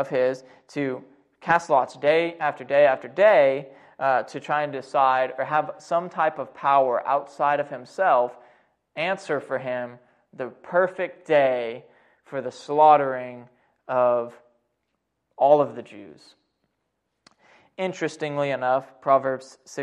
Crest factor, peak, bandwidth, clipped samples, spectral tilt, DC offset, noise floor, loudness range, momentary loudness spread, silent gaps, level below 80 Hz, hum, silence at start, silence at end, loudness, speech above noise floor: 20 dB; -4 dBFS; 10 kHz; under 0.1%; -5.5 dB/octave; under 0.1%; -77 dBFS; 6 LU; 15 LU; none; -74 dBFS; none; 0 s; 0 s; -23 LUFS; 54 dB